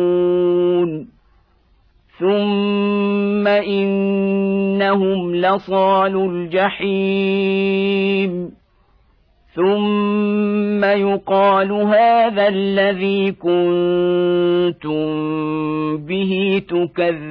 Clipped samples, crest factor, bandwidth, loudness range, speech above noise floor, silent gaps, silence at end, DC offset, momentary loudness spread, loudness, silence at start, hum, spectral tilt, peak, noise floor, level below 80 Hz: under 0.1%; 14 dB; 5.2 kHz; 4 LU; 39 dB; none; 0 s; under 0.1%; 6 LU; -17 LUFS; 0 s; none; -9.5 dB/octave; -4 dBFS; -56 dBFS; -56 dBFS